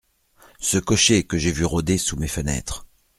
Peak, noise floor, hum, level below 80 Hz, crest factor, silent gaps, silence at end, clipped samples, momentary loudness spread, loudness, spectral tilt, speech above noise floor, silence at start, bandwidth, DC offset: -4 dBFS; -55 dBFS; none; -38 dBFS; 20 dB; none; 0.35 s; under 0.1%; 11 LU; -21 LUFS; -3.5 dB/octave; 34 dB; 0.6 s; 15.5 kHz; under 0.1%